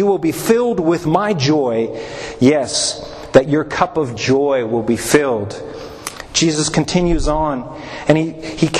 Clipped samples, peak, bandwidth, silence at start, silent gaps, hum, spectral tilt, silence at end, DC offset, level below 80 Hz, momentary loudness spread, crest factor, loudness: under 0.1%; 0 dBFS; 13.5 kHz; 0 s; none; none; -4.5 dB/octave; 0 s; under 0.1%; -34 dBFS; 13 LU; 16 dB; -16 LUFS